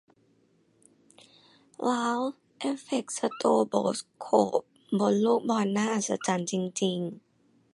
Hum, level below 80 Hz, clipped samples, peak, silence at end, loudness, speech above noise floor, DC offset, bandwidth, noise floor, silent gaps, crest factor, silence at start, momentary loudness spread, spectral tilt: none; -76 dBFS; under 0.1%; -8 dBFS; 0.55 s; -28 LUFS; 39 dB; under 0.1%; 11.5 kHz; -66 dBFS; none; 22 dB; 1.8 s; 9 LU; -5 dB/octave